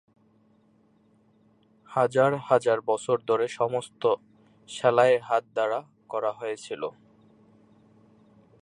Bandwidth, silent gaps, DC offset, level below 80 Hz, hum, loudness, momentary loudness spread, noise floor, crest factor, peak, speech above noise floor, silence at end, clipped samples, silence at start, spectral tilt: 11 kHz; none; under 0.1%; -76 dBFS; none; -26 LUFS; 13 LU; -63 dBFS; 20 dB; -6 dBFS; 38 dB; 1.7 s; under 0.1%; 1.9 s; -5 dB/octave